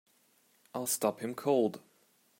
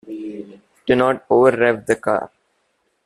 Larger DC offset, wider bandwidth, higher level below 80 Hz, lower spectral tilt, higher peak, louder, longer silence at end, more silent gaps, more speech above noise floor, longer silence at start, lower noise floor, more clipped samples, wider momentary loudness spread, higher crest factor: neither; first, 16 kHz vs 12 kHz; second, -86 dBFS vs -56 dBFS; second, -4 dB/octave vs -6 dB/octave; second, -16 dBFS vs -2 dBFS; second, -32 LUFS vs -17 LUFS; second, 0.6 s vs 0.8 s; neither; second, 37 dB vs 51 dB; first, 0.75 s vs 0.05 s; about the same, -69 dBFS vs -67 dBFS; neither; second, 13 LU vs 17 LU; about the same, 20 dB vs 16 dB